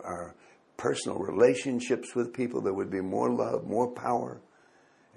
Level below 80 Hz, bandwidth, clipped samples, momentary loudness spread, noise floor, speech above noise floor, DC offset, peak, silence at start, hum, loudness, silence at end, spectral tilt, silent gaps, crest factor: -66 dBFS; 11.5 kHz; under 0.1%; 16 LU; -62 dBFS; 33 dB; under 0.1%; -10 dBFS; 0 s; none; -30 LUFS; 0.75 s; -5.5 dB/octave; none; 20 dB